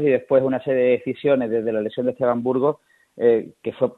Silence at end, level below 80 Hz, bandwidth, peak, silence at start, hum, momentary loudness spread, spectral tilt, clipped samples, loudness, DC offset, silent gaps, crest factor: 0.05 s; -64 dBFS; 4.1 kHz; -4 dBFS; 0 s; none; 6 LU; -9 dB/octave; under 0.1%; -21 LUFS; under 0.1%; none; 16 dB